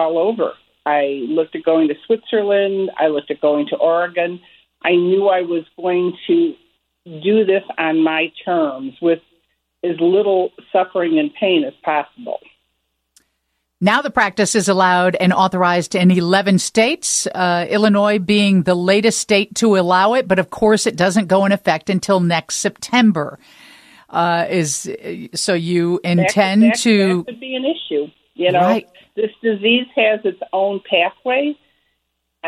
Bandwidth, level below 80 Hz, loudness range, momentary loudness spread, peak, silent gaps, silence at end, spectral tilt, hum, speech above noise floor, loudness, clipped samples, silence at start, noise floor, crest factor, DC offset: 14.5 kHz; -58 dBFS; 4 LU; 9 LU; -2 dBFS; none; 0 s; -4.5 dB/octave; none; 55 dB; -16 LUFS; under 0.1%; 0 s; -72 dBFS; 16 dB; under 0.1%